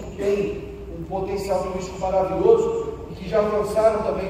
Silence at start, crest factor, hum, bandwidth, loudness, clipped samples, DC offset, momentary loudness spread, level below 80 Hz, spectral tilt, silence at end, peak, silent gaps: 0 s; 18 dB; none; 15.5 kHz; -22 LUFS; under 0.1%; under 0.1%; 14 LU; -40 dBFS; -6.5 dB/octave; 0 s; -4 dBFS; none